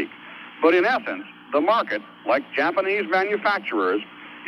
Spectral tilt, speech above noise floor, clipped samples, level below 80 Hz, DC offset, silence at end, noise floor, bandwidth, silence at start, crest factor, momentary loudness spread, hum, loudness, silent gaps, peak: -5.5 dB/octave; 19 dB; under 0.1%; -76 dBFS; under 0.1%; 0 s; -41 dBFS; 12 kHz; 0 s; 18 dB; 13 LU; none; -22 LUFS; none; -4 dBFS